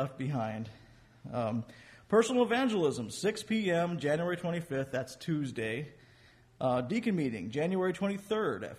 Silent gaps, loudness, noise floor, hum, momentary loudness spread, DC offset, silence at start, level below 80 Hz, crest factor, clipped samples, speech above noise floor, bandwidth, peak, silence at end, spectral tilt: none; -32 LUFS; -61 dBFS; none; 10 LU; under 0.1%; 0 s; -68 dBFS; 18 dB; under 0.1%; 29 dB; 14.5 kHz; -14 dBFS; 0 s; -6 dB/octave